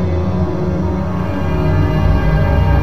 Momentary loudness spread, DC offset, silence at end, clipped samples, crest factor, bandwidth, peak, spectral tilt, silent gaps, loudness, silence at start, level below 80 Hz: 5 LU; 5%; 0 s; under 0.1%; 12 dB; 6.4 kHz; -2 dBFS; -9 dB/octave; none; -16 LUFS; 0 s; -20 dBFS